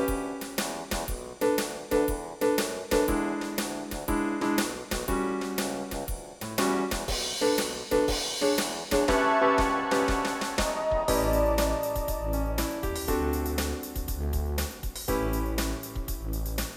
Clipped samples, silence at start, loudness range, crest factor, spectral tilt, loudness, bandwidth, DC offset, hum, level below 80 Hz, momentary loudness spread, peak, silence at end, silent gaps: under 0.1%; 0 s; 5 LU; 16 dB; -4 dB/octave; -28 LUFS; 19 kHz; under 0.1%; none; -36 dBFS; 8 LU; -12 dBFS; 0 s; none